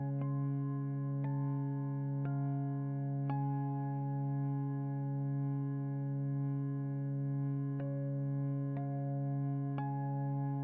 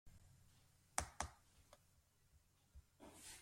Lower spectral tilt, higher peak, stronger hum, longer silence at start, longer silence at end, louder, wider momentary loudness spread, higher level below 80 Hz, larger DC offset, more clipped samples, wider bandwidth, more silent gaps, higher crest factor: first, -12 dB/octave vs -2 dB/octave; second, -26 dBFS vs -20 dBFS; neither; about the same, 0 s vs 0.05 s; about the same, 0 s vs 0 s; first, -37 LUFS vs -50 LUFS; second, 2 LU vs 23 LU; second, -72 dBFS vs -66 dBFS; neither; neither; second, 2.5 kHz vs 16.5 kHz; neither; second, 10 dB vs 36 dB